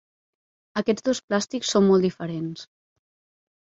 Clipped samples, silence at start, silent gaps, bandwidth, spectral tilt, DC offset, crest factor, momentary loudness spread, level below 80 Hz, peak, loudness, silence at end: under 0.1%; 0.75 s; 1.24-1.28 s; 8 kHz; -5 dB/octave; under 0.1%; 18 dB; 13 LU; -66 dBFS; -8 dBFS; -24 LUFS; 1.05 s